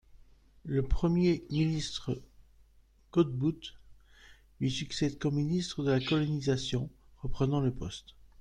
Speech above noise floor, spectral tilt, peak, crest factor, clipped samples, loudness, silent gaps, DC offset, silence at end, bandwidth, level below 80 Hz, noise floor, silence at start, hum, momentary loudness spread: 32 dB; -6.5 dB/octave; -14 dBFS; 18 dB; under 0.1%; -32 LUFS; none; under 0.1%; 0.15 s; 10 kHz; -46 dBFS; -62 dBFS; 0.15 s; none; 14 LU